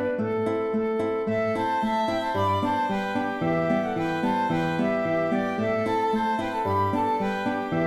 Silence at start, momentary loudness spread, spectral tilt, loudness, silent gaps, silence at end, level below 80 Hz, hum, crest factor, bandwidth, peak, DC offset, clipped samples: 0 s; 2 LU; -7 dB/octave; -25 LUFS; none; 0 s; -56 dBFS; none; 12 dB; 15 kHz; -12 dBFS; under 0.1%; under 0.1%